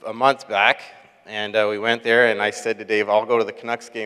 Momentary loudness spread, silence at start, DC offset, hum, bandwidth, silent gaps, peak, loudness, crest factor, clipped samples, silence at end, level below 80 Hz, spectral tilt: 11 LU; 0.05 s; under 0.1%; none; 13.5 kHz; none; 0 dBFS; -20 LUFS; 20 dB; under 0.1%; 0 s; -78 dBFS; -3.5 dB/octave